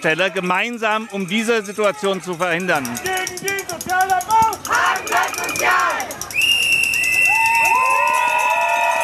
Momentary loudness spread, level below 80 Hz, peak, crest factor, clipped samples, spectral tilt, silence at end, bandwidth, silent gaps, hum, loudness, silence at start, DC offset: 9 LU; -54 dBFS; -4 dBFS; 14 dB; under 0.1%; -2 dB/octave; 0 s; 14.5 kHz; none; none; -17 LUFS; 0 s; under 0.1%